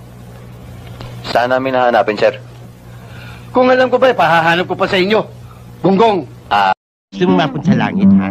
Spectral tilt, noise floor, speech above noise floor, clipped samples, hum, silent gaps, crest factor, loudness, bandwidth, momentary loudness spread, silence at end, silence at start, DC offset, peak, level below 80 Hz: -7 dB/octave; -34 dBFS; 22 dB; under 0.1%; none; 6.77-7.08 s; 14 dB; -13 LUFS; 14.5 kHz; 22 LU; 0 s; 0 s; under 0.1%; 0 dBFS; -46 dBFS